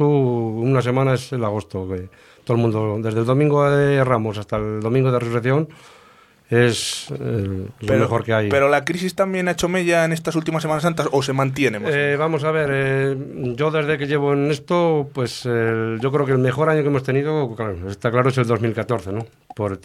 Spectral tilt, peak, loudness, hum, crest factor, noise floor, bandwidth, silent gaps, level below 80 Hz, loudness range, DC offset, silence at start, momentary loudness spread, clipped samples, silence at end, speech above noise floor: -6.5 dB/octave; -2 dBFS; -20 LUFS; none; 18 dB; -51 dBFS; 14 kHz; none; -50 dBFS; 2 LU; under 0.1%; 0 s; 9 LU; under 0.1%; 0.05 s; 31 dB